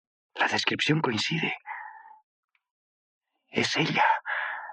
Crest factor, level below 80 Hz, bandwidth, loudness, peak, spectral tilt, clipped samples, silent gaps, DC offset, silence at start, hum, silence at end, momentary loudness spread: 20 dB; -78 dBFS; 10 kHz; -26 LUFS; -10 dBFS; -4 dB/octave; under 0.1%; 2.23-2.48 s, 2.71-3.21 s; under 0.1%; 0.35 s; none; 0 s; 16 LU